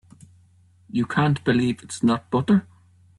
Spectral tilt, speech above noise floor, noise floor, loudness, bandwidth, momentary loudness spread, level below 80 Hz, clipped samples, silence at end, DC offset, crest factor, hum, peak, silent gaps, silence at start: -6.5 dB/octave; 35 dB; -56 dBFS; -22 LUFS; 11.5 kHz; 6 LU; -56 dBFS; under 0.1%; 0.55 s; under 0.1%; 16 dB; none; -8 dBFS; none; 0.95 s